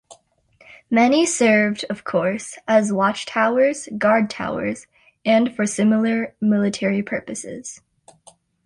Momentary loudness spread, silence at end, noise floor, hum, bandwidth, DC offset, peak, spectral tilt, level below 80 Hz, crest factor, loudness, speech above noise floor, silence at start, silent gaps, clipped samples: 12 LU; 0.9 s; -56 dBFS; none; 11.5 kHz; under 0.1%; -4 dBFS; -4.5 dB/octave; -62 dBFS; 16 dB; -20 LUFS; 37 dB; 0.1 s; none; under 0.1%